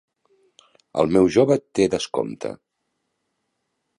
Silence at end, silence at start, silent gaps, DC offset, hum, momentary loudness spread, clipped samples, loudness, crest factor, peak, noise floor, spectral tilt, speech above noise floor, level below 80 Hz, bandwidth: 1.45 s; 0.95 s; none; under 0.1%; none; 16 LU; under 0.1%; -20 LUFS; 20 dB; -4 dBFS; -76 dBFS; -6 dB/octave; 56 dB; -54 dBFS; 11 kHz